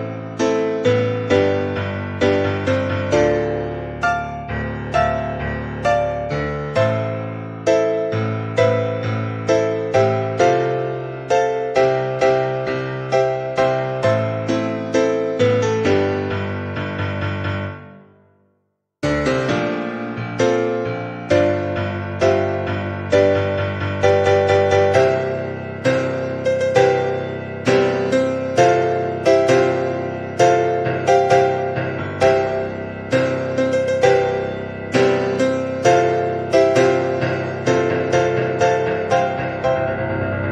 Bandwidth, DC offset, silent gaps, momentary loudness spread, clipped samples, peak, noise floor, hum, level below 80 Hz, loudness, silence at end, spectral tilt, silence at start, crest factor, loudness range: 10 kHz; under 0.1%; none; 9 LU; under 0.1%; -2 dBFS; -69 dBFS; none; -44 dBFS; -19 LUFS; 0 s; -6 dB/octave; 0 s; 18 dB; 4 LU